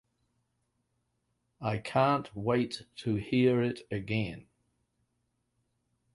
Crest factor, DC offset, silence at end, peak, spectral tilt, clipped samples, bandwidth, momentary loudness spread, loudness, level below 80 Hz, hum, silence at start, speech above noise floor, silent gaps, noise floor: 20 dB; under 0.1%; 1.75 s; -14 dBFS; -7 dB/octave; under 0.1%; 11.5 kHz; 11 LU; -31 LUFS; -62 dBFS; 60 Hz at -55 dBFS; 1.6 s; 49 dB; none; -79 dBFS